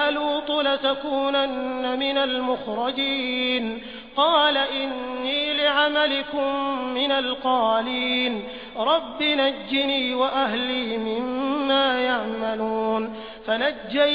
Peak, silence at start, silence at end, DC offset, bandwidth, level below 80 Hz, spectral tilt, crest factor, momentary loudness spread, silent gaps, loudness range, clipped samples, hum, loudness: -6 dBFS; 0 s; 0 s; 0.2%; 5.2 kHz; -58 dBFS; -5.5 dB/octave; 16 dB; 7 LU; none; 2 LU; under 0.1%; none; -23 LUFS